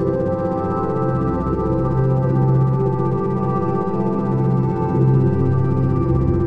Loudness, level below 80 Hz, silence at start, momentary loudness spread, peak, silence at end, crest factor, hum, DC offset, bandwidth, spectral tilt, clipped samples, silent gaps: -19 LUFS; -34 dBFS; 0 s; 4 LU; -4 dBFS; 0 s; 12 dB; none; 1%; 2.9 kHz; -11.5 dB/octave; under 0.1%; none